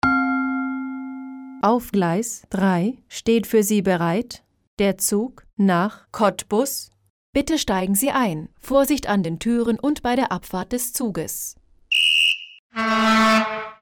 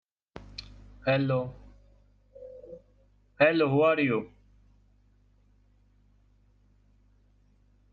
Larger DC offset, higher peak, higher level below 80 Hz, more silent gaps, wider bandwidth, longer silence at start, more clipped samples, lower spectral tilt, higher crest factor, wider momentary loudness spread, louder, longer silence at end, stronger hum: neither; about the same, -6 dBFS vs -8 dBFS; first, -50 dBFS vs -58 dBFS; first, 4.67-4.77 s, 7.10-7.33 s, 12.59-12.70 s vs none; first, over 20 kHz vs 7 kHz; second, 0.05 s vs 0.35 s; neither; second, -4 dB/octave vs -8 dB/octave; second, 16 dB vs 24 dB; second, 12 LU vs 27 LU; first, -21 LUFS vs -26 LUFS; second, 0.05 s vs 3.65 s; second, none vs 50 Hz at -60 dBFS